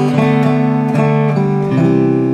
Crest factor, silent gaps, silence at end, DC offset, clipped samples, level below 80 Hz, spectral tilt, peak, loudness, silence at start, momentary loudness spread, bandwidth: 12 dB; none; 0 s; under 0.1%; under 0.1%; -50 dBFS; -9 dB/octave; 0 dBFS; -13 LUFS; 0 s; 2 LU; 8.8 kHz